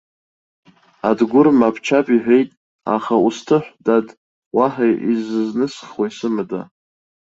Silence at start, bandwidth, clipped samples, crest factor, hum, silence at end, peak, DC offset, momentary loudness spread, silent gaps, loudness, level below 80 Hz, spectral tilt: 1.05 s; 7.8 kHz; under 0.1%; 16 dB; none; 0.7 s; -2 dBFS; under 0.1%; 11 LU; 2.57-2.79 s, 4.17-4.51 s; -18 LUFS; -62 dBFS; -6.5 dB/octave